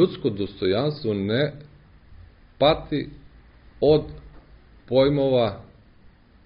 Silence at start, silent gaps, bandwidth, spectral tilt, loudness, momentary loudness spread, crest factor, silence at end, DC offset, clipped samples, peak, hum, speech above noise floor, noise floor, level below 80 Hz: 0 s; none; 5.4 kHz; -5.5 dB/octave; -23 LUFS; 10 LU; 18 dB; 0.85 s; under 0.1%; under 0.1%; -6 dBFS; none; 31 dB; -52 dBFS; -48 dBFS